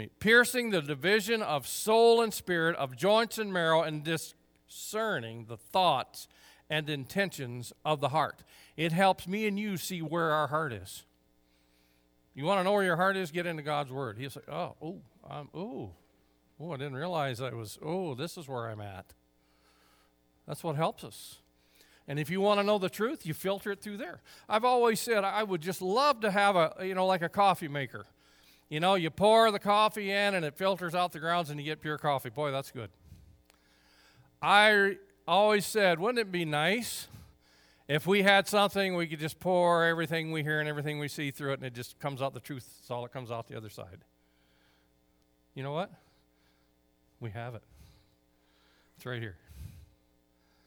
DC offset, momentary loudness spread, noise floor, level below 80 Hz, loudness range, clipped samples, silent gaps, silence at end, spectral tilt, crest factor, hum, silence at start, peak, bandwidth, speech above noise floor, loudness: under 0.1%; 19 LU; -69 dBFS; -68 dBFS; 16 LU; under 0.1%; none; 0.8 s; -4.5 dB/octave; 24 dB; none; 0 s; -8 dBFS; over 20 kHz; 39 dB; -30 LUFS